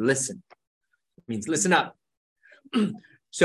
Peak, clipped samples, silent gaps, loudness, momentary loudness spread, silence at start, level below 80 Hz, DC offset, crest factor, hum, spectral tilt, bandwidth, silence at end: -4 dBFS; under 0.1%; 0.67-0.81 s, 2.17-2.36 s; -26 LUFS; 17 LU; 0 s; -68 dBFS; under 0.1%; 24 dB; none; -3.5 dB/octave; 12.5 kHz; 0 s